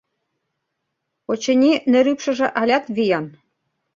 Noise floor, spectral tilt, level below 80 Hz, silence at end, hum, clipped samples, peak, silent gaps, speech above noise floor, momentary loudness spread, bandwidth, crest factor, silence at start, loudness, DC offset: -77 dBFS; -4.5 dB/octave; -64 dBFS; 0.65 s; none; under 0.1%; -4 dBFS; none; 59 dB; 11 LU; 7.6 kHz; 16 dB; 1.3 s; -18 LUFS; under 0.1%